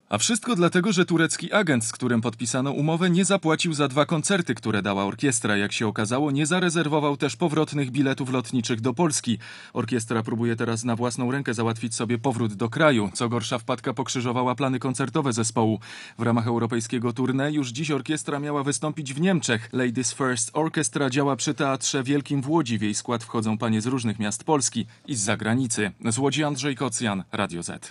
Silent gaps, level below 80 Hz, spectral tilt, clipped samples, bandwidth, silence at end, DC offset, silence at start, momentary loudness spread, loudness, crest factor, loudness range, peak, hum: none; -70 dBFS; -4.5 dB/octave; under 0.1%; 12 kHz; 0 s; under 0.1%; 0.1 s; 6 LU; -24 LUFS; 20 dB; 3 LU; -4 dBFS; none